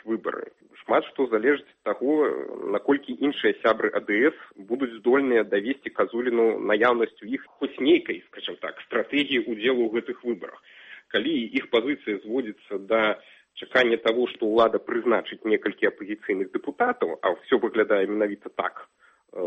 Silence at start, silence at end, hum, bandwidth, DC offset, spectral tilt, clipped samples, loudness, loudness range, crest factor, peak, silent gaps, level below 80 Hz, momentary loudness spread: 0.05 s; 0 s; none; 6.4 kHz; under 0.1%; -6 dB/octave; under 0.1%; -25 LUFS; 3 LU; 18 dB; -6 dBFS; none; -70 dBFS; 12 LU